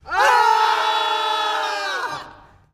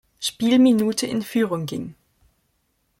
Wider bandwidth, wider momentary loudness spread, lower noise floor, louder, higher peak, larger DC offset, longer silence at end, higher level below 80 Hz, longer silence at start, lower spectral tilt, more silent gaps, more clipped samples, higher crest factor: about the same, 15.5 kHz vs 16.5 kHz; second, 11 LU vs 15 LU; second, -45 dBFS vs -69 dBFS; about the same, -19 LUFS vs -21 LUFS; about the same, -4 dBFS vs -6 dBFS; neither; second, 0.4 s vs 1.1 s; about the same, -58 dBFS vs -62 dBFS; second, 0.05 s vs 0.2 s; second, 0 dB/octave vs -4.5 dB/octave; neither; neither; about the same, 16 dB vs 16 dB